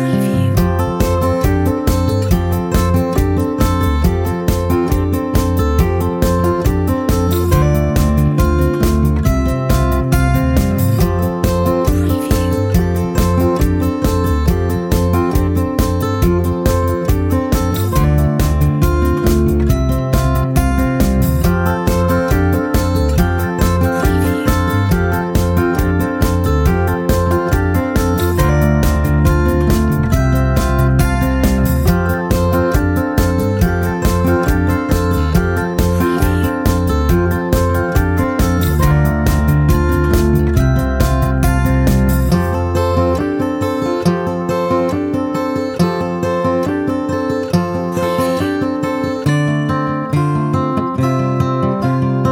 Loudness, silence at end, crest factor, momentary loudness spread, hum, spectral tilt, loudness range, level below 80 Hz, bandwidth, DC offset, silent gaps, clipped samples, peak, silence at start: -15 LUFS; 0 s; 14 dB; 3 LU; none; -7 dB/octave; 3 LU; -20 dBFS; 17 kHz; under 0.1%; none; under 0.1%; 0 dBFS; 0 s